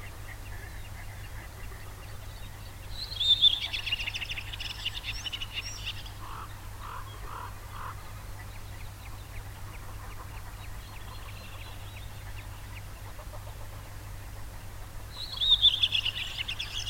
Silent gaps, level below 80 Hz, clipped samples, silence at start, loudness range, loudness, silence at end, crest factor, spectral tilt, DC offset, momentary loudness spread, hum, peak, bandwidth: none; -44 dBFS; under 0.1%; 0 s; 16 LU; -28 LUFS; 0 s; 24 dB; -2 dB/octave; under 0.1%; 21 LU; none; -12 dBFS; 17 kHz